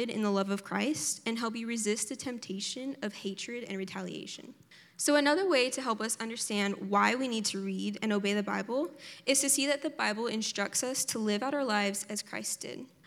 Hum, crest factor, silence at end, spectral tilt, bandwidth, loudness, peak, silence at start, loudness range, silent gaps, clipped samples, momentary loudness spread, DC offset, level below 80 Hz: none; 22 dB; 0.2 s; -3 dB/octave; 17 kHz; -31 LUFS; -10 dBFS; 0 s; 6 LU; none; under 0.1%; 11 LU; under 0.1%; -88 dBFS